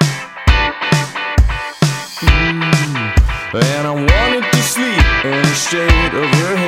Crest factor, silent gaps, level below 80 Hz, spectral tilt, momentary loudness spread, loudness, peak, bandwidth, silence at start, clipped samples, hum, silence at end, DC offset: 14 dB; none; -18 dBFS; -4.5 dB/octave; 4 LU; -14 LUFS; 0 dBFS; 16.5 kHz; 0 s; under 0.1%; none; 0 s; under 0.1%